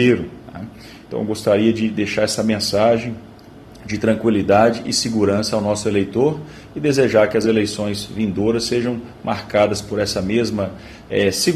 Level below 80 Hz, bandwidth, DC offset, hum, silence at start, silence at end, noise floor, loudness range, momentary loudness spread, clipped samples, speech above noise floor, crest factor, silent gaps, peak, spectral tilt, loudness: -48 dBFS; 13.5 kHz; under 0.1%; none; 0 s; 0 s; -41 dBFS; 2 LU; 14 LU; under 0.1%; 23 dB; 18 dB; none; 0 dBFS; -5 dB/octave; -18 LUFS